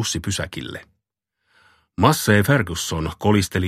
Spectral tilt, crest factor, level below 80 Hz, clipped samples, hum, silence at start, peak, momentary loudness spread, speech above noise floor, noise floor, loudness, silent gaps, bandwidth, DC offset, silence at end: -4.5 dB/octave; 20 dB; -44 dBFS; under 0.1%; none; 0 s; -2 dBFS; 17 LU; 58 dB; -78 dBFS; -20 LUFS; none; 15 kHz; under 0.1%; 0 s